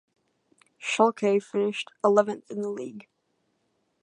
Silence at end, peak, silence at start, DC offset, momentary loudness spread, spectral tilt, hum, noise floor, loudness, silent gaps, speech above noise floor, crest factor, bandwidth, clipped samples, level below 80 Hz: 1 s; -6 dBFS; 0.8 s; under 0.1%; 13 LU; -4.5 dB/octave; none; -74 dBFS; -26 LUFS; none; 49 dB; 22 dB; 10.5 kHz; under 0.1%; -82 dBFS